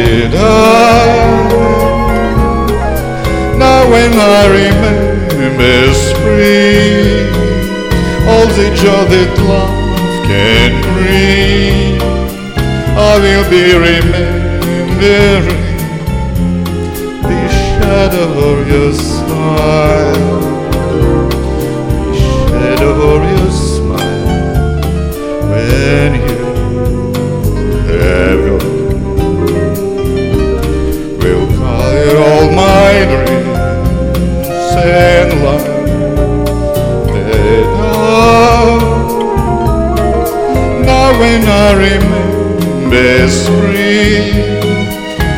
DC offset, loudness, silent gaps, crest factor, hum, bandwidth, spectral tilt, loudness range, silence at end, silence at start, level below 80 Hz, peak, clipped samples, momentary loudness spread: under 0.1%; -10 LUFS; none; 8 dB; none; 17.5 kHz; -6 dB/octave; 4 LU; 0 s; 0 s; -18 dBFS; 0 dBFS; 0.6%; 8 LU